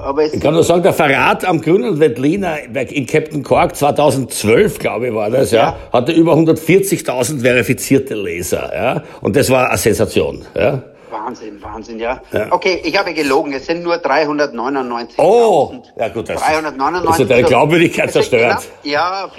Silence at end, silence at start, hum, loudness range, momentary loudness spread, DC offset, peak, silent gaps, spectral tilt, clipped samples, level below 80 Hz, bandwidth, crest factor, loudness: 0 s; 0 s; none; 4 LU; 10 LU; under 0.1%; 0 dBFS; none; -5 dB/octave; under 0.1%; -44 dBFS; 16.5 kHz; 14 dB; -14 LUFS